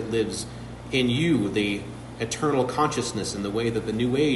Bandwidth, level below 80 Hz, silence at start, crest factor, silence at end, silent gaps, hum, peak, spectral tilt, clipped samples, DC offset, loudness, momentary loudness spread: 11.5 kHz; -48 dBFS; 0 s; 16 dB; 0 s; none; none; -10 dBFS; -5 dB/octave; under 0.1%; under 0.1%; -25 LUFS; 10 LU